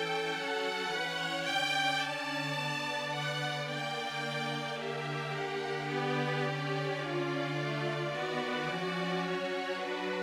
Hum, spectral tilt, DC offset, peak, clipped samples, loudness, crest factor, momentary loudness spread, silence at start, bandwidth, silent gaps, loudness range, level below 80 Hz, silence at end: none; -4.5 dB/octave; under 0.1%; -20 dBFS; under 0.1%; -34 LUFS; 14 dB; 4 LU; 0 s; 16 kHz; none; 2 LU; -76 dBFS; 0 s